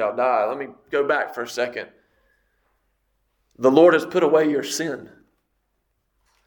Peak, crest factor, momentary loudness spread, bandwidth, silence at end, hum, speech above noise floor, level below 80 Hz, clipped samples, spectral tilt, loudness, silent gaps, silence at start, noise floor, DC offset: -2 dBFS; 22 dB; 16 LU; 19 kHz; 1.4 s; none; 52 dB; -68 dBFS; under 0.1%; -4.5 dB/octave; -20 LUFS; none; 0 s; -72 dBFS; under 0.1%